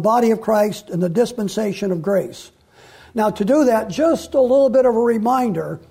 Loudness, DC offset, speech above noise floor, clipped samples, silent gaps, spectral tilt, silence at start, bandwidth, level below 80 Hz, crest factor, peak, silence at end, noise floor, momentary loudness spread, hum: -18 LUFS; under 0.1%; 29 dB; under 0.1%; none; -6.5 dB/octave; 0 s; 16 kHz; -54 dBFS; 12 dB; -6 dBFS; 0.1 s; -47 dBFS; 8 LU; none